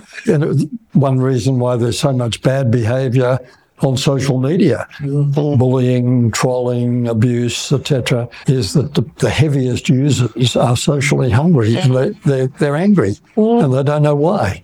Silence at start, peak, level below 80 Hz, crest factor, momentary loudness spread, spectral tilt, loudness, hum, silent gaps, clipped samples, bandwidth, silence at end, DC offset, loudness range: 0.15 s; -2 dBFS; -46 dBFS; 12 dB; 4 LU; -6.5 dB/octave; -15 LUFS; none; none; under 0.1%; 13.5 kHz; 0.05 s; under 0.1%; 2 LU